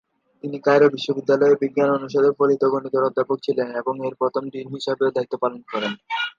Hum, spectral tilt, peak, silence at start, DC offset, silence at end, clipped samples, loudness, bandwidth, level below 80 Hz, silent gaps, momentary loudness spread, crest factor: none; -6 dB/octave; -2 dBFS; 0.45 s; under 0.1%; 0.1 s; under 0.1%; -21 LUFS; 7.4 kHz; -72 dBFS; none; 10 LU; 18 dB